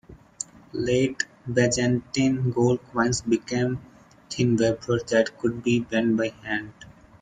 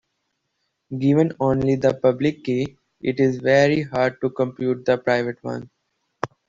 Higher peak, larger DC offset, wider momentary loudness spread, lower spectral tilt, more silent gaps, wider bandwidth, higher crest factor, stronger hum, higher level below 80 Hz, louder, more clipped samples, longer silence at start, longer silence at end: about the same, -6 dBFS vs -4 dBFS; neither; second, 11 LU vs 14 LU; second, -5.5 dB/octave vs -7 dB/octave; neither; first, 9.6 kHz vs 7.6 kHz; about the same, 18 dB vs 18 dB; neither; about the same, -54 dBFS vs -54 dBFS; second, -24 LUFS vs -21 LUFS; neither; second, 0.1 s vs 0.9 s; about the same, 0.3 s vs 0.25 s